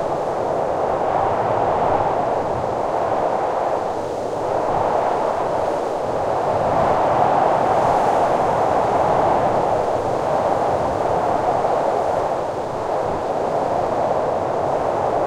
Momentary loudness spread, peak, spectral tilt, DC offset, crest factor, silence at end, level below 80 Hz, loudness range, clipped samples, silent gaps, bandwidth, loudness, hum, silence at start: 5 LU; -4 dBFS; -6.5 dB/octave; under 0.1%; 16 dB; 0 s; -46 dBFS; 3 LU; under 0.1%; none; 14 kHz; -20 LUFS; none; 0 s